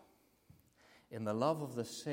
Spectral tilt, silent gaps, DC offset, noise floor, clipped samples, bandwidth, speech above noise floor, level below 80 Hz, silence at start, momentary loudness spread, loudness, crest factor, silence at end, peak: -6 dB/octave; none; under 0.1%; -69 dBFS; under 0.1%; 16.5 kHz; 31 dB; -80 dBFS; 1.1 s; 9 LU; -38 LUFS; 22 dB; 0 s; -20 dBFS